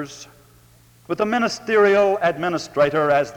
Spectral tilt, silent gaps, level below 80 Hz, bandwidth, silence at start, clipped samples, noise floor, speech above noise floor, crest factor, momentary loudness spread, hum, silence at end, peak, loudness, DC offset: -5 dB/octave; none; -58 dBFS; 18 kHz; 0 s; under 0.1%; -52 dBFS; 33 dB; 16 dB; 13 LU; none; 0 s; -4 dBFS; -19 LUFS; under 0.1%